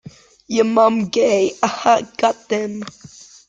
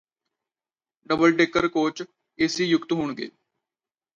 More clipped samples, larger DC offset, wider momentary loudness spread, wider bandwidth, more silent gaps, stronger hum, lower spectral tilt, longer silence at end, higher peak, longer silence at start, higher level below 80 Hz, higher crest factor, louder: neither; neither; second, 10 LU vs 18 LU; first, 9.2 kHz vs 7.6 kHz; neither; neither; about the same, -4.5 dB/octave vs -4.5 dB/octave; second, 0.6 s vs 0.85 s; first, -2 dBFS vs -6 dBFS; second, 0.05 s vs 1.1 s; about the same, -60 dBFS vs -60 dBFS; about the same, 18 dB vs 20 dB; first, -17 LUFS vs -23 LUFS